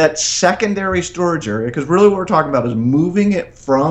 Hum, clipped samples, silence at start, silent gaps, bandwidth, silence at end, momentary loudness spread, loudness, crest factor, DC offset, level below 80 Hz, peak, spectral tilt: none; under 0.1%; 0 s; none; 9.2 kHz; 0 s; 7 LU; -15 LUFS; 14 dB; under 0.1%; -44 dBFS; 0 dBFS; -5 dB/octave